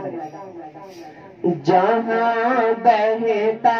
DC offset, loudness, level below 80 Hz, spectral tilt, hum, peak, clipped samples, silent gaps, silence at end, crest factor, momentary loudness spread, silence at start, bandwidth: under 0.1%; -18 LUFS; -70 dBFS; -7 dB/octave; none; -2 dBFS; under 0.1%; none; 0 s; 16 dB; 21 LU; 0 s; 6.8 kHz